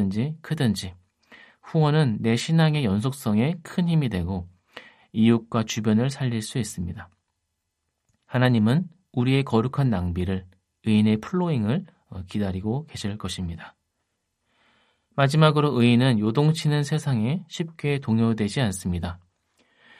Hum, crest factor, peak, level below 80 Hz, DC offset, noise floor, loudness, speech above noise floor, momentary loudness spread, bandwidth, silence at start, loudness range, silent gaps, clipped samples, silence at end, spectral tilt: none; 20 dB; -4 dBFS; -58 dBFS; under 0.1%; -78 dBFS; -24 LUFS; 56 dB; 13 LU; 13.5 kHz; 0 s; 5 LU; none; under 0.1%; 0.85 s; -6.5 dB/octave